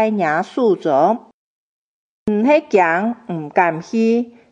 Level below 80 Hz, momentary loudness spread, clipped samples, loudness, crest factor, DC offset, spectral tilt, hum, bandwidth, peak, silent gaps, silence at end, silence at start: -62 dBFS; 8 LU; under 0.1%; -17 LUFS; 16 dB; under 0.1%; -7 dB/octave; none; 8 kHz; 0 dBFS; 1.33-2.26 s; 0.2 s; 0 s